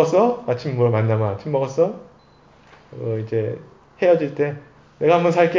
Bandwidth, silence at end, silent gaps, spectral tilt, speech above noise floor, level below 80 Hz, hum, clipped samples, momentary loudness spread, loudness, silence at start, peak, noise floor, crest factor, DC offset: 7.6 kHz; 0 s; none; -7.5 dB/octave; 32 dB; -58 dBFS; none; under 0.1%; 12 LU; -20 LUFS; 0 s; -2 dBFS; -51 dBFS; 18 dB; under 0.1%